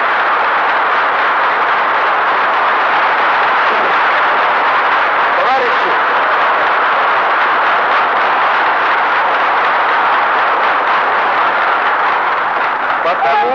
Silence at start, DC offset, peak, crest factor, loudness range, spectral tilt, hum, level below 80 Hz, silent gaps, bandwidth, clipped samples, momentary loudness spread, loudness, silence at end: 0 s; 0.2%; -2 dBFS; 10 dB; 1 LU; -3.5 dB/octave; none; -62 dBFS; none; 7.4 kHz; under 0.1%; 1 LU; -12 LUFS; 0 s